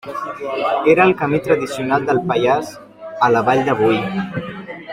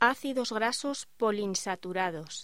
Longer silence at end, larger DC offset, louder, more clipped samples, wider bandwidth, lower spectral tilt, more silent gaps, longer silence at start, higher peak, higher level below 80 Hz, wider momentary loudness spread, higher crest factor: about the same, 0 s vs 0 s; second, under 0.1% vs 0.2%; first, -17 LUFS vs -31 LUFS; neither; about the same, 15.5 kHz vs 16 kHz; first, -6.5 dB/octave vs -3 dB/octave; neither; about the same, 0.05 s vs 0 s; first, -2 dBFS vs -10 dBFS; first, -54 dBFS vs -72 dBFS; first, 15 LU vs 4 LU; second, 16 dB vs 22 dB